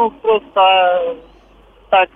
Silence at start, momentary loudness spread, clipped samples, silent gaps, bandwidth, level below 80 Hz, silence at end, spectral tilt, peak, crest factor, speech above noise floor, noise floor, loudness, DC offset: 0 s; 12 LU; under 0.1%; none; 3.8 kHz; -50 dBFS; 0.1 s; -5.5 dB/octave; -2 dBFS; 14 dB; 32 dB; -46 dBFS; -14 LUFS; under 0.1%